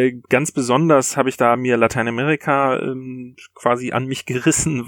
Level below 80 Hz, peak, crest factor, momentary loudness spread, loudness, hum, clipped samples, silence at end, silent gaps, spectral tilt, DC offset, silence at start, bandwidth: -50 dBFS; -2 dBFS; 18 dB; 10 LU; -18 LUFS; none; under 0.1%; 0 s; none; -4.5 dB/octave; under 0.1%; 0 s; 18.5 kHz